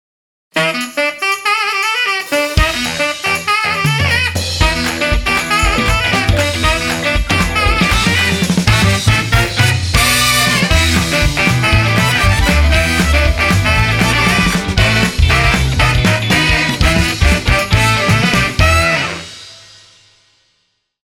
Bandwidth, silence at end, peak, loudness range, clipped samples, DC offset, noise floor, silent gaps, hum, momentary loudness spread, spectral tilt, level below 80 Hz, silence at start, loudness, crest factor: 19 kHz; 1.5 s; 0 dBFS; 3 LU; under 0.1%; under 0.1%; -64 dBFS; none; none; 4 LU; -4 dB/octave; -22 dBFS; 0.55 s; -12 LUFS; 14 dB